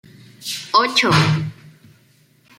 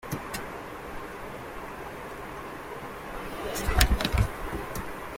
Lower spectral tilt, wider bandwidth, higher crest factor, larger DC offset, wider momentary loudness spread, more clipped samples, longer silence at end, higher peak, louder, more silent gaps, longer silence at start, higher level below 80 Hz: about the same, -4.5 dB/octave vs -4 dB/octave; about the same, 16 kHz vs 16.5 kHz; second, 20 dB vs 28 dB; neither; about the same, 16 LU vs 14 LU; neither; first, 0.9 s vs 0 s; about the same, -2 dBFS vs -4 dBFS; first, -17 LUFS vs -32 LUFS; neither; first, 0.4 s vs 0 s; second, -58 dBFS vs -34 dBFS